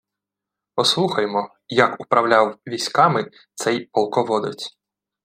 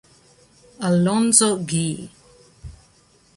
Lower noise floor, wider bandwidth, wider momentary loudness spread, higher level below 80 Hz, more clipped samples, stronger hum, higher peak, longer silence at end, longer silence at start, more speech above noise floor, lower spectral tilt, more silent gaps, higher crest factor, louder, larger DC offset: first, -86 dBFS vs -56 dBFS; first, 16 kHz vs 12 kHz; second, 11 LU vs 16 LU; second, -70 dBFS vs -52 dBFS; neither; neither; about the same, 0 dBFS vs 0 dBFS; about the same, 0.55 s vs 0.65 s; about the same, 0.75 s vs 0.8 s; first, 66 dB vs 37 dB; about the same, -4 dB/octave vs -4 dB/octave; neither; about the same, 20 dB vs 22 dB; about the same, -20 LUFS vs -18 LUFS; neither